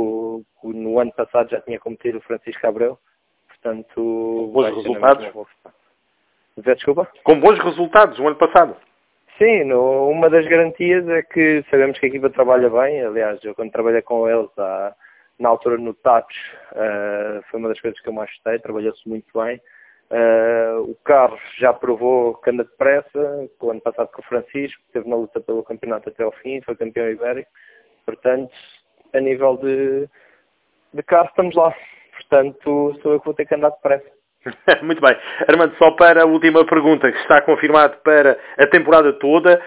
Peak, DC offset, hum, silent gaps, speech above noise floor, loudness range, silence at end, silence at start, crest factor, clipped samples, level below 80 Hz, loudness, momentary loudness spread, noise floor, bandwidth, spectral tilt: 0 dBFS; under 0.1%; none; none; 49 dB; 12 LU; 0 s; 0 s; 16 dB; under 0.1%; -58 dBFS; -16 LUFS; 15 LU; -65 dBFS; 4 kHz; -9 dB/octave